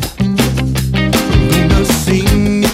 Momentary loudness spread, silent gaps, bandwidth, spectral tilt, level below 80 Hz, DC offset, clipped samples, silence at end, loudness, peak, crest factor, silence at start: 4 LU; none; 16.5 kHz; -5.5 dB/octave; -20 dBFS; under 0.1%; under 0.1%; 0 s; -13 LUFS; 0 dBFS; 12 dB; 0 s